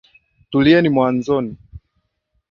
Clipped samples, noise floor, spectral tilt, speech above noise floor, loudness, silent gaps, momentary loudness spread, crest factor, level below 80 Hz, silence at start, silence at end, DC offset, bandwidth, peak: under 0.1%; -69 dBFS; -7.5 dB/octave; 54 dB; -16 LUFS; none; 9 LU; 18 dB; -48 dBFS; 0.5 s; 0.7 s; under 0.1%; 7 kHz; -2 dBFS